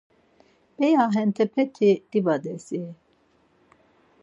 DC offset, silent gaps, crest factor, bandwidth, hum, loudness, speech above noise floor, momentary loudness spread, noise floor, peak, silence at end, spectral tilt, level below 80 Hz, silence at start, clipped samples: under 0.1%; none; 16 dB; 8 kHz; none; -23 LUFS; 41 dB; 13 LU; -63 dBFS; -8 dBFS; 1.3 s; -7 dB/octave; -76 dBFS; 0.8 s; under 0.1%